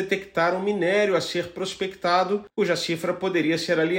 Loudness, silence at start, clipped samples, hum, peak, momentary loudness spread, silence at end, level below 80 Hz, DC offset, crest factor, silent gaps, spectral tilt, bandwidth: -24 LUFS; 0 s; under 0.1%; none; -10 dBFS; 7 LU; 0 s; -62 dBFS; under 0.1%; 14 dB; none; -4.5 dB/octave; 16 kHz